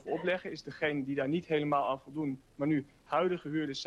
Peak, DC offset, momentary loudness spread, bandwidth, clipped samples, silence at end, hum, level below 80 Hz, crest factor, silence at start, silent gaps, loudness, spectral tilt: -18 dBFS; under 0.1%; 6 LU; 9.6 kHz; under 0.1%; 0 s; none; -68 dBFS; 16 dB; 0.05 s; none; -34 LUFS; -6.5 dB/octave